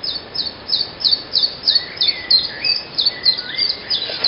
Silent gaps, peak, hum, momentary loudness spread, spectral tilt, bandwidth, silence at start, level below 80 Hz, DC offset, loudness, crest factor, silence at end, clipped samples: none; -2 dBFS; none; 6 LU; -5.5 dB/octave; 5.8 kHz; 0 s; -52 dBFS; under 0.1%; -16 LUFS; 16 dB; 0 s; under 0.1%